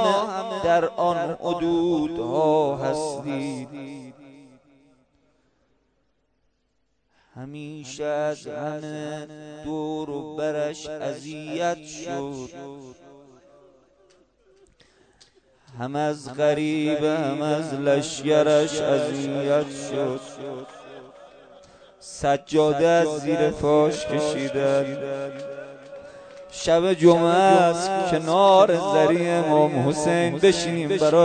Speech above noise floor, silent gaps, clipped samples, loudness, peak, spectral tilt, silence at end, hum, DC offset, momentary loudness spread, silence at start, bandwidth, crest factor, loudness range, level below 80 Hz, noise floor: 49 dB; none; under 0.1%; -22 LUFS; -2 dBFS; -5.5 dB/octave; 0 s; none; under 0.1%; 19 LU; 0 s; 9.4 kHz; 20 dB; 15 LU; -58 dBFS; -72 dBFS